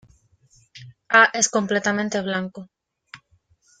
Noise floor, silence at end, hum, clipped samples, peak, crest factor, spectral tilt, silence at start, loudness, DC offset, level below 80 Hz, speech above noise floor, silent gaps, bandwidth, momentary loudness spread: -62 dBFS; 0.65 s; none; under 0.1%; -2 dBFS; 22 dB; -2.5 dB/octave; 0.75 s; -19 LUFS; under 0.1%; -66 dBFS; 42 dB; none; 9.8 kHz; 15 LU